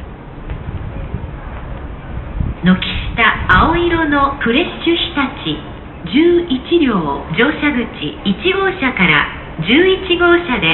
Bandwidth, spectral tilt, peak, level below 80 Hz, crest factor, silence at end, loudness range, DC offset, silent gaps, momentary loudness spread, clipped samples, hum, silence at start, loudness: 4.3 kHz; -8.5 dB/octave; 0 dBFS; -28 dBFS; 16 dB; 0 s; 2 LU; under 0.1%; none; 17 LU; under 0.1%; none; 0 s; -14 LUFS